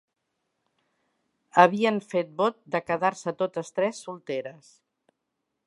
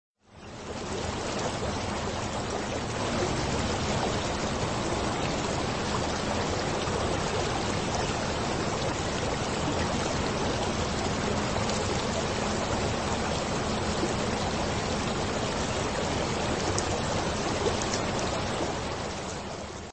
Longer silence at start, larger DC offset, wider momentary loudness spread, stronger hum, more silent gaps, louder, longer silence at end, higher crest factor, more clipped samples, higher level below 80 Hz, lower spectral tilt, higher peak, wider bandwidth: first, 1.55 s vs 0.25 s; second, under 0.1% vs 0.2%; first, 14 LU vs 3 LU; neither; neither; first, -26 LUFS vs -29 LUFS; first, 1.15 s vs 0 s; first, 26 dB vs 20 dB; neither; second, -76 dBFS vs -42 dBFS; first, -5.5 dB/octave vs -4 dB/octave; first, -2 dBFS vs -10 dBFS; first, 11.5 kHz vs 8.8 kHz